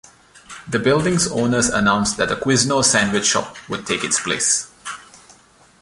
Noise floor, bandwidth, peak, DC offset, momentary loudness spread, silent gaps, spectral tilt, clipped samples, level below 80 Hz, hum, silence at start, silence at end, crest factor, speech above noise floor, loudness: -51 dBFS; 11.5 kHz; 0 dBFS; under 0.1%; 17 LU; none; -3 dB/octave; under 0.1%; -48 dBFS; none; 0.35 s; 0.65 s; 20 dB; 33 dB; -18 LUFS